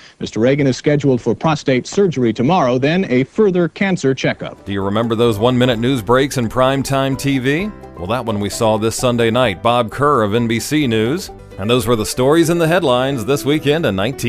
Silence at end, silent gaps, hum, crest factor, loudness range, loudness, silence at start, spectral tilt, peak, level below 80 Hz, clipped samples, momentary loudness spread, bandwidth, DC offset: 0 s; none; none; 14 dB; 1 LU; -16 LUFS; 0.2 s; -5.5 dB/octave; 0 dBFS; -42 dBFS; under 0.1%; 6 LU; 15.5 kHz; under 0.1%